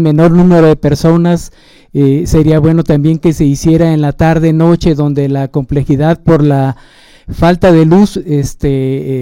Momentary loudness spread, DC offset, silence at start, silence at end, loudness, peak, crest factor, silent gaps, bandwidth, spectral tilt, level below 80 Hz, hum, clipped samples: 8 LU; under 0.1%; 0 s; 0 s; -9 LUFS; 0 dBFS; 8 dB; none; 15.5 kHz; -8 dB/octave; -28 dBFS; none; under 0.1%